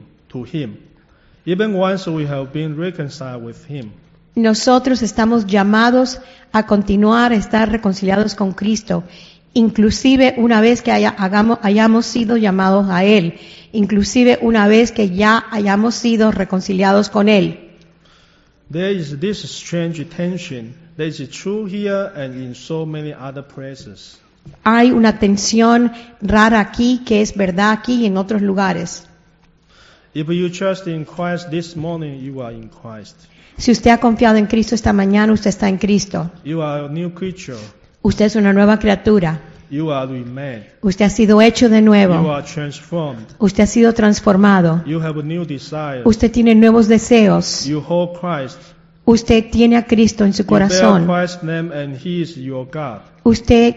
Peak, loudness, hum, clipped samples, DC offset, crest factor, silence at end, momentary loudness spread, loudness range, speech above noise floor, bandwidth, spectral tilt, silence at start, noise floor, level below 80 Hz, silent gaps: 0 dBFS; -14 LUFS; none; under 0.1%; under 0.1%; 14 dB; 0 s; 16 LU; 10 LU; 38 dB; 8 kHz; -5 dB/octave; 0.35 s; -52 dBFS; -40 dBFS; none